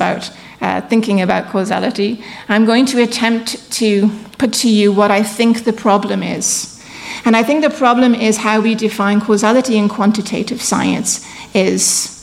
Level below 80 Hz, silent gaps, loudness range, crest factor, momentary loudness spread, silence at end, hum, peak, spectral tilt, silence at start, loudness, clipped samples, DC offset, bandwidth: -54 dBFS; none; 2 LU; 12 dB; 8 LU; 0 s; none; -2 dBFS; -4 dB/octave; 0 s; -14 LUFS; under 0.1%; under 0.1%; 15.5 kHz